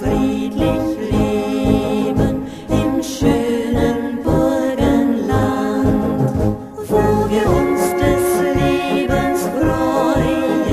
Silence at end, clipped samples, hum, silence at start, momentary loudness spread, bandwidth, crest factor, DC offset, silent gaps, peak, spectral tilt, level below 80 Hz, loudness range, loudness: 0 s; under 0.1%; none; 0 s; 4 LU; 14.5 kHz; 14 dB; under 0.1%; none; -2 dBFS; -6.5 dB/octave; -30 dBFS; 2 LU; -17 LUFS